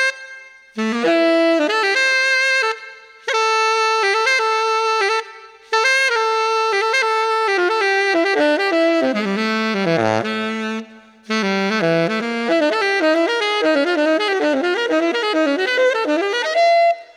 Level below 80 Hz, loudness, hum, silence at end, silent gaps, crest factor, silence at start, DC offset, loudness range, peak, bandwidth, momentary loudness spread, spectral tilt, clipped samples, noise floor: -76 dBFS; -17 LUFS; none; 0.1 s; none; 12 dB; 0 s; under 0.1%; 3 LU; -6 dBFS; 14.5 kHz; 7 LU; -3.5 dB/octave; under 0.1%; -40 dBFS